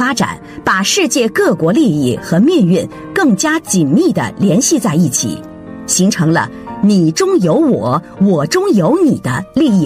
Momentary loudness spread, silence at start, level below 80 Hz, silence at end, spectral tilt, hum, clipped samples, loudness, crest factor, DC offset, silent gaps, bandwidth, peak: 6 LU; 0 s; -48 dBFS; 0 s; -5 dB/octave; none; under 0.1%; -13 LUFS; 12 dB; under 0.1%; none; 16 kHz; 0 dBFS